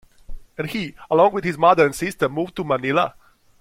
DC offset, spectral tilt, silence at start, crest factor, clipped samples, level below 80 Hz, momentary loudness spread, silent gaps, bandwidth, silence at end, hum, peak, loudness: under 0.1%; -5.5 dB/octave; 0.3 s; 20 dB; under 0.1%; -44 dBFS; 12 LU; none; 16.5 kHz; 0.5 s; none; -2 dBFS; -20 LUFS